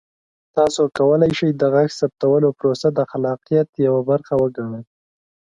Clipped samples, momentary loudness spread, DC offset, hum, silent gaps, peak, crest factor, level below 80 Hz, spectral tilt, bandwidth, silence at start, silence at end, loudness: under 0.1%; 7 LU; under 0.1%; none; 3.69-3.73 s; -2 dBFS; 16 dB; -56 dBFS; -6.5 dB/octave; 10 kHz; 0.55 s; 0.75 s; -18 LUFS